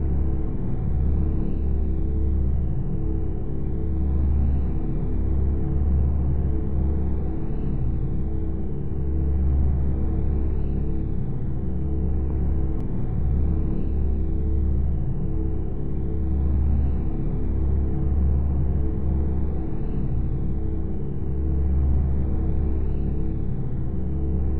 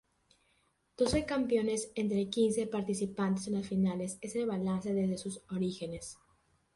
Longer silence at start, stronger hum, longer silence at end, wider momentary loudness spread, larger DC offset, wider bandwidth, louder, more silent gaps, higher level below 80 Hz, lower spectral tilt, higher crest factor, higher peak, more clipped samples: second, 0 s vs 1 s; neither; second, 0 s vs 0.6 s; second, 5 LU vs 9 LU; first, 5% vs under 0.1%; second, 2.5 kHz vs 11.5 kHz; first, -26 LUFS vs -33 LUFS; neither; first, -24 dBFS vs -58 dBFS; first, -12.5 dB/octave vs -5.5 dB/octave; second, 10 dB vs 18 dB; first, -10 dBFS vs -16 dBFS; neither